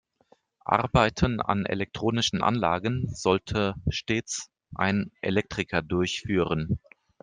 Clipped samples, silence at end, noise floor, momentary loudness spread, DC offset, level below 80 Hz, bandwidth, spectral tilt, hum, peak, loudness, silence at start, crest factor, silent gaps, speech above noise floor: under 0.1%; 0.45 s; -64 dBFS; 7 LU; under 0.1%; -46 dBFS; 10 kHz; -5 dB/octave; none; -4 dBFS; -27 LUFS; 0.65 s; 22 dB; none; 37 dB